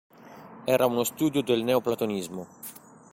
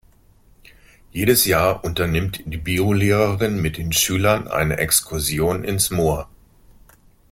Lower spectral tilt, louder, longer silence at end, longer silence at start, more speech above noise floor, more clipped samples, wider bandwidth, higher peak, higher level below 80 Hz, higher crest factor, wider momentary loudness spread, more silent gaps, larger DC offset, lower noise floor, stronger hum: about the same, -5 dB/octave vs -4 dB/octave; second, -26 LUFS vs -19 LUFS; second, 0.35 s vs 1.05 s; second, 0.2 s vs 1.15 s; second, 21 dB vs 33 dB; neither; about the same, 16.5 kHz vs 16.5 kHz; second, -8 dBFS vs -2 dBFS; second, -66 dBFS vs -40 dBFS; about the same, 18 dB vs 18 dB; first, 18 LU vs 7 LU; neither; neither; second, -47 dBFS vs -53 dBFS; neither